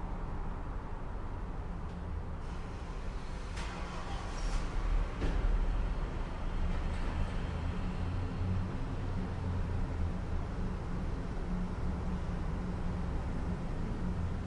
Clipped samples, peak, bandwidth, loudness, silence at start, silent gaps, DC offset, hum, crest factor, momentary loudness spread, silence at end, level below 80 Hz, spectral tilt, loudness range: under 0.1%; -20 dBFS; 10.5 kHz; -39 LUFS; 0 s; none; under 0.1%; none; 16 dB; 7 LU; 0 s; -36 dBFS; -7 dB/octave; 5 LU